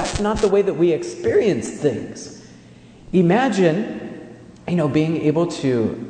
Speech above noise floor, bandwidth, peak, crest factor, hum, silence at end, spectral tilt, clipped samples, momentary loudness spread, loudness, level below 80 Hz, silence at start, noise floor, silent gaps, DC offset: 26 dB; 9.4 kHz; -4 dBFS; 16 dB; none; 0 s; -6.5 dB/octave; under 0.1%; 17 LU; -19 LUFS; -44 dBFS; 0 s; -44 dBFS; none; under 0.1%